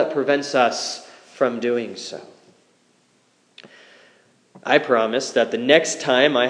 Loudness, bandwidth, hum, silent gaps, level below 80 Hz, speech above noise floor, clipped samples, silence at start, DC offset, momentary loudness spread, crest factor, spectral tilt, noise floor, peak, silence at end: -20 LUFS; 10.5 kHz; none; none; -82 dBFS; 42 dB; under 0.1%; 0 s; under 0.1%; 17 LU; 22 dB; -3 dB/octave; -61 dBFS; 0 dBFS; 0 s